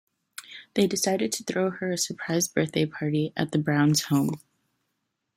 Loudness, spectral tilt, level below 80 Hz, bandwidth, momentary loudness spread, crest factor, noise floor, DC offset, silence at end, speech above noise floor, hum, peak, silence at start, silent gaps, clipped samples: -26 LUFS; -4.5 dB/octave; -66 dBFS; 16.5 kHz; 15 LU; 18 dB; -79 dBFS; under 0.1%; 1 s; 54 dB; none; -8 dBFS; 0.4 s; none; under 0.1%